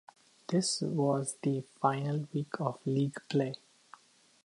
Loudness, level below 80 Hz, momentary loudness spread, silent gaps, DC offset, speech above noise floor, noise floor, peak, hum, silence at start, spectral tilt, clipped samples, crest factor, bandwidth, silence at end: -33 LUFS; -80 dBFS; 6 LU; none; under 0.1%; 27 dB; -59 dBFS; -12 dBFS; none; 0.5 s; -5.5 dB/octave; under 0.1%; 20 dB; 11.5 kHz; 0.9 s